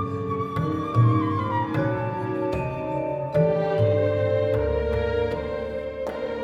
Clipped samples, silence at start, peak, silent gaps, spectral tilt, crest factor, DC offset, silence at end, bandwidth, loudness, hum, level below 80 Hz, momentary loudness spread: under 0.1%; 0 s; -8 dBFS; none; -9 dB/octave; 16 dB; under 0.1%; 0 s; 7.2 kHz; -25 LUFS; none; -40 dBFS; 8 LU